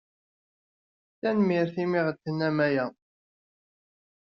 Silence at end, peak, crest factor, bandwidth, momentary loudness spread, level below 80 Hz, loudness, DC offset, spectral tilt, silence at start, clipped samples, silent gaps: 1.3 s; -12 dBFS; 18 dB; 6.4 kHz; 6 LU; -72 dBFS; -27 LUFS; under 0.1%; -6 dB/octave; 1.25 s; under 0.1%; none